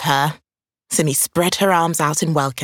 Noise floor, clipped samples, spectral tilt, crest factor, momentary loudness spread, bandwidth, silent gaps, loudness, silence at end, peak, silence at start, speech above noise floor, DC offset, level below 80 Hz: -46 dBFS; under 0.1%; -3.5 dB/octave; 18 dB; 4 LU; 19.5 kHz; none; -18 LUFS; 0 s; -2 dBFS; 0 s; 29 dB; under 0.1%; -58 dBFS